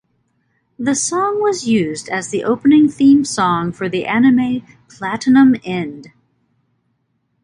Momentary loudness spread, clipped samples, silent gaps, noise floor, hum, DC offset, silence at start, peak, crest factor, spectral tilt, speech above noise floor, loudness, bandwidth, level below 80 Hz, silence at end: 12 LU; under 0.1%; none; -66 dBFS; none; under 0.1%; 0.8 s; -2 dBFS; 14 dB; -4.5 dB/octave; 52 dB; -15 LUFS; 11 kHz; -56 dBFS; 1.4 s